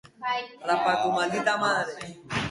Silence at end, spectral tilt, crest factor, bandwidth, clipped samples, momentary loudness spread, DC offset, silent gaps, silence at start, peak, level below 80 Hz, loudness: 0 s; -4 dB/octave; 16 dB; 11.5 kHz; under 0.1%; 8 LU; under 0.1%; none; 0.2 s; -10 dBFS; -60 dBFS; -26 LUFS